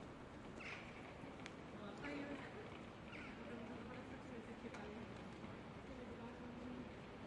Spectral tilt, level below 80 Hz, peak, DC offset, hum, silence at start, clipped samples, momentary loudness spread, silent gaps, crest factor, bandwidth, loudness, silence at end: -6 dB/octave; -68 dBFS; -32 dBFS; under 0.1%; none; 0 s; under 0.1%; 4 LU; none; 20 dB; 11 kHz; -53 LUFS; 0 s